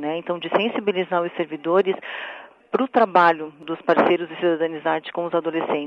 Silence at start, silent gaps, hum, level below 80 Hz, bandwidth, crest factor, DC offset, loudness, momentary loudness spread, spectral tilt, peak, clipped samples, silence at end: 0 s; none; none; -74 dBFS; 6.4 kHz; 20 dB; under 0.1%; -22 LUFS; 11 LU; -7 dB/octave; -2 dBFS; under 0.1%; 0 s